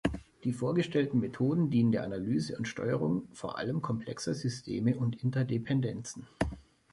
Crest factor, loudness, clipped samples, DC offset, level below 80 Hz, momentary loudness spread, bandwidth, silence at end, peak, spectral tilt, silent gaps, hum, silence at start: 18 dB; -32 LUFS; under 0.1%; under 0.1%; -54 dBFS; 8 LU; 11.5 kHz; 0.3 s; -14 dBFS; -7 dB/octave; none; none; 0.05 s